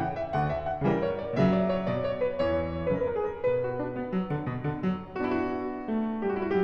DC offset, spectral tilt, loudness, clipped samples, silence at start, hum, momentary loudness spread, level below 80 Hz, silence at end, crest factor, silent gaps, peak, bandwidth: under 0.1%; -9 dB/octave; -29 LUFS; under 0.1%; 0 s; none; 5 LU; -50 dBFS; 0 s; 16 dB; none; -12 dBFS; 6.6 kHz